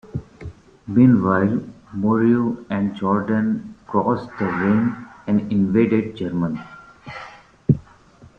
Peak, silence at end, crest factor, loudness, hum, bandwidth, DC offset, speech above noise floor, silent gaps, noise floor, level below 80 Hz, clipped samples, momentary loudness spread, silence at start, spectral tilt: -2 dBFS; 0.6 s; 18 dB; -20 LUFS; none; 6.2 kHz; under 0.1%; 30 dB; none; -48 dBFS; -50 dBFS; under 0.1%; 20 LU; 0.05 s; -10 dB/octave